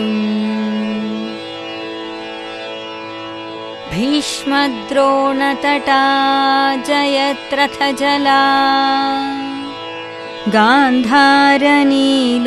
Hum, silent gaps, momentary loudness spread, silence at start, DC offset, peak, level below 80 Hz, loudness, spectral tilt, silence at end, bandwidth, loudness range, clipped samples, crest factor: none; none; 16 LU; 0 s; under 0.1%; 0 dBFS; -52 dBFS; -14 LUFS; -4 dB/octave; 0 s; 13 kHz; 9 LU; under 0.1%; 14 dB